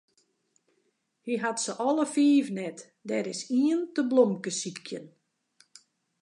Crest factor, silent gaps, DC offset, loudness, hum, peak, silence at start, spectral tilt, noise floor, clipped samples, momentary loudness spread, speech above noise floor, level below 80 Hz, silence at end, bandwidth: 20 dB; none; under 0.1%; -27 LUFS; none; -10 dBFS; 1.25 s; -4.5 dB/octave; -74 dBFS; under 0.1%; 16 LU; 47 dB; -86 dBFS; 1.15 s; 11 kHz